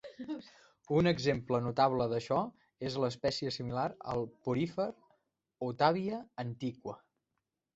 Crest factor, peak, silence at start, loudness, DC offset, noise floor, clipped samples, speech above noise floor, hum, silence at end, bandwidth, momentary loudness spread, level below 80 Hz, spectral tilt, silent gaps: 22 dB; -12 dBFS; 0.05 s; -34 LUFS; under 0.1%; -86 dBFS; under 0.1%; 53 dB; none; 0.8 s; 8 kHz; 13 LU; -64 dBFS; -5 dB/octave; none